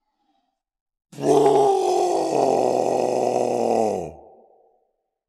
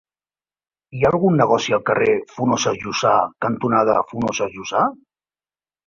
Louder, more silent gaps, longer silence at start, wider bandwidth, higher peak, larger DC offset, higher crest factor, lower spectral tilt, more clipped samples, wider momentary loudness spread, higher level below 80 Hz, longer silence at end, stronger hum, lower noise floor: about the same, -20 LUFS vs -19 LUFS; neither; first, 1.15 s vs 0.95 s; first, 13.5 kHz vs 7.4 kHz; about the same, -4 dBFS vs -2 dBFS; neither; about the same, 18 dB vs 18 dB; about the same, -5.5 dB/octave vs -5 dB/octave; neither; about the same, 8 LU vs 6 LU; second, -64 dBFS vs -54 dBFS; first, 1.15 s vs 0.9 s; neither; second, -72 dBFS vs under -90 dBFS